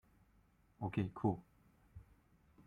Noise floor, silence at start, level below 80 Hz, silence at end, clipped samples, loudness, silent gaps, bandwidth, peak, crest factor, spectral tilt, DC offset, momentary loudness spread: -72 dBFS; 0.8 s; -68 dBFS; 0.05 s; under 0.1%; -41 LUFS; none; 9.6 kHz; -22 dBFS; 22 dB; -9.5 dB/octave; under 0.1%; 24 LU